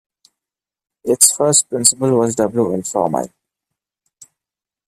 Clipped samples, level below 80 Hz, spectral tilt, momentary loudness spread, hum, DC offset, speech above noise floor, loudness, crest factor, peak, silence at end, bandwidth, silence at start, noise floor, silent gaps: under 0.1%; -60 dBFS; -3.5 dB/octave; 11 LU; none; under 0.1%; 73 dB; -14 LUFS; 18 dB; 0 dBFS; 1.6 s; 16 kHz; 1.05 s; -89 dBFS; none